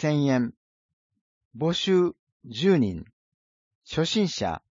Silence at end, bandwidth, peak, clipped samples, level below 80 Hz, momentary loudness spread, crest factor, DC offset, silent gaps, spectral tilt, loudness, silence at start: 0.15 s; 7.6 kHz; -8 dBFS; under 0.1%; -58 dBFS; 11 LU; 18 dB; under 0.1%; 0.57-1.10 s, 1.21-1.51 s, 2.19-2.40 s, 3.13-3.81 s; -6 dB/octave; -25 LUFS; 0 s